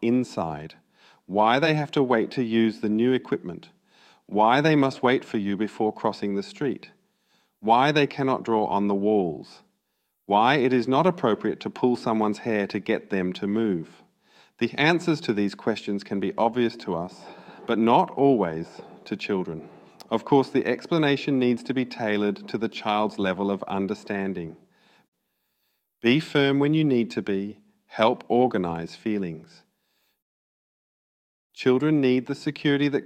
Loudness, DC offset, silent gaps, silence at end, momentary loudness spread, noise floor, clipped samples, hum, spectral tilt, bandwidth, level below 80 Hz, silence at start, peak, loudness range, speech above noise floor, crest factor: -24 LUFS; under 0.1%; 25.08-25.12 s, 30.22-31.50 s; 0 s; 11 LU; -76 dBFS; under 0.1%; none; -6.5 dB/octave; 9.8 kHz; -66 dBFS; 0 s; -4 dBFS; 4 LU; 52 dB; 20 dB